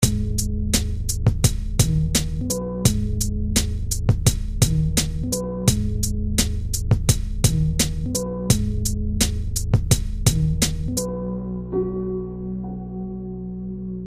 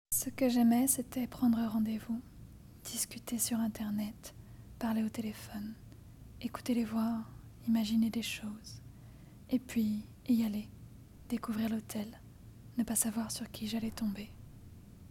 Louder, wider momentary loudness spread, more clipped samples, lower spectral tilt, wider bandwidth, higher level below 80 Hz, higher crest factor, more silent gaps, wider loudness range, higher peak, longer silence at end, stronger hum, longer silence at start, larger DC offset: first, -23 LUFS vs -35 LUFS; second, 10 LU vs 23 LU; neither; about the same, -4.5 dB/octave vs -4 dB/octave; about the same, 15.5 kHz vs 17 kHz; first, -26 dBFS vs -60 dBFS; about the same, 20 dB vs 20 dB; neither; second, 2 LU vs 5 LU; first, -2 dBFS vs -16 dBFS; about the same, 0 s vs 0 s; neither; about the same, 0 s vs 0.1 s; neither